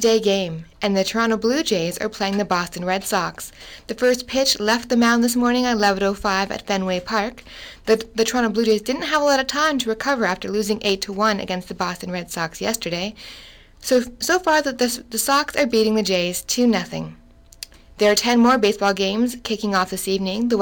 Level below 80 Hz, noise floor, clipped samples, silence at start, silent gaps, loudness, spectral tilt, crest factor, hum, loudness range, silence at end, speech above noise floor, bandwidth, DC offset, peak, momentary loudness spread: -48 dBFS; -41 dBFS; under 0.1%; 0 s; none; -20 LUFS; -3.5 dB/octave; 14 dB; none; 4 LU; 0 s; 21 dB; 19 kHz; under 0.1%; -6 dBFS; 12 LU